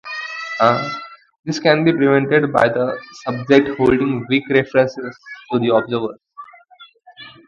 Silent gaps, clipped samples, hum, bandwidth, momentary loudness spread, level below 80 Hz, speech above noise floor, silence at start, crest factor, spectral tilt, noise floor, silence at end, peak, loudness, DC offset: 1.39-1.43 s; under 0.1%; none; 7.4 kHz; 16 LU; -52 dBFS; 30 dB; 0.05 s; 18 dB; -6.5 dB/octave; -47 dBFS; 0.2 s; 0 dBFS; -17 LUFS; under 0.1%